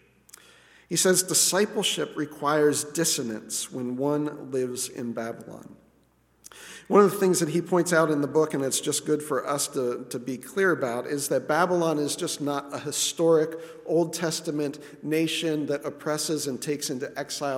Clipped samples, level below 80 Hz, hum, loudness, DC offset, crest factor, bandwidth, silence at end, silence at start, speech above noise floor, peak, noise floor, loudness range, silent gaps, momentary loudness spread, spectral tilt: under 0.1%; -72 dBFS; none; -25 LUFS; under 0.1%; 20 dB; 17 kHz; 0 s; 0.9 s; 38 dB; -6 dBFS; -64 dBFS; 5 LU; none; 12 LU; -3.5 dB/octave